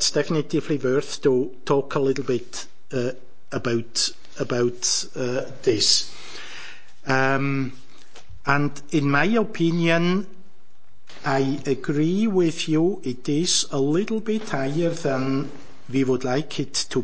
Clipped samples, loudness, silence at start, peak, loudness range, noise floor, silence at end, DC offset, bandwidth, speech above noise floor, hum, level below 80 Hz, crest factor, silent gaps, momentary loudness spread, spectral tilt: under 0.1%; -23 LUFS; 0 s; -4 dBFS; 3 LU; -62 dBFS; 0 s; 3%; 8 kHz; 39 dB; none; -60 dBFS; 20 dB; none; 12 LU; -4 dB/octave